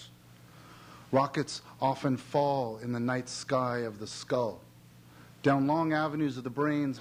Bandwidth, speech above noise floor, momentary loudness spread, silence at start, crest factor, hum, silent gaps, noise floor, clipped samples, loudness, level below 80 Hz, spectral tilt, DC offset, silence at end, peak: 16 kHz; 25 dB; 11 LU; 0 s; 18 dB; none; none; -55 dBFS; under 0.1%; -31 LUFS; -68 dBFS; -6 dB/octave; under 0.1%; 0 s; -12 dBFS